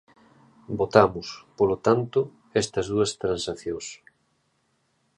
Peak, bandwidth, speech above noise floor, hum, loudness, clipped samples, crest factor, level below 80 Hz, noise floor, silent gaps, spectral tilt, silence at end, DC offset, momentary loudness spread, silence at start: -2 dBFS; 11 kHz; 46 dB; none; -25 LUFS; under 0.1%; 24 dB; -54 dBFS; -70 dBFS; none; -5 dB/octave; 1.2 s; under 0.1%; 16 LU; 0.7 s